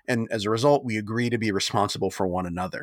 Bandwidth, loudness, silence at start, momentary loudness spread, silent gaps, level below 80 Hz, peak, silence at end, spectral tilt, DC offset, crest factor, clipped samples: 18.5 kHz; -25 LUFS; 0.1 s; 6 LU; none; -58 dBFS; -8 dBFS; 0 s; -5 dB/octave; under 0.1%; 18 dB; under 0.1%